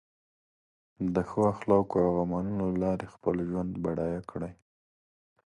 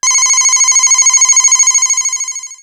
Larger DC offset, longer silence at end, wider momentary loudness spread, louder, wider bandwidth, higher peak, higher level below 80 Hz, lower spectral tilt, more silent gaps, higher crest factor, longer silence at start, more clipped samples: neither; first, 0.95 s vs 0.05 s; about the same, 10 LU vs 8 LU; second, -30 LUFS vs -6 LUFS; second, 10.5 kHz vs 19.5 kHz; second, -12 dBFS vs 0 dBFS; first, -54 dBFS vs -70 dBFS; first, -9.5 dB/octave vs 6.5 dB/octave; neither; first, 20 dB vs 10 dB; first, 1 s vs 0.05 s; neither